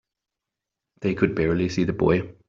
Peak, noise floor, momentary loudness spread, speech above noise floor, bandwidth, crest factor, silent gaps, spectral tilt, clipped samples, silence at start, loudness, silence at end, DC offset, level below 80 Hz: -6 dBFS; -86 dBFS; 5 LU; 63 dB; 7.6 kHz; 18 dB; none; -7.5 dB/octave; under 0.1%; 1 s; -23 LUFS; 0.15 s; under 0.1%; -48 dBFS